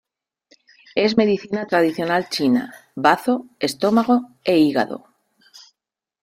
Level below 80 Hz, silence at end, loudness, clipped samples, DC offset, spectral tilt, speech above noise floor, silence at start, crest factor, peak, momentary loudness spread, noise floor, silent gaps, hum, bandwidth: -64 dBFS; 1.25 s; -19 LUFS; under 0.1%; under 0.1%; -5.5 dB/octave; 64 dB; 0.95 s; 20 dB; -2 dBFS; 8 LU; -83 dBFS; none; none; 16 kHz